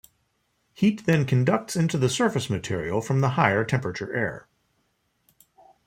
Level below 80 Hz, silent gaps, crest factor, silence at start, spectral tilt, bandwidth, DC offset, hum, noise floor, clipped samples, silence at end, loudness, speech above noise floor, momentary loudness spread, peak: -60 dBFS; none; 22 dB; 0.8 s; -6 dB/octave; 15.5 kHz; under 0.1%; none; -71 dBFS; under 0.1%; 1.45 s; -24 LUFS; 48 dB; 7 LU; -2 dBFS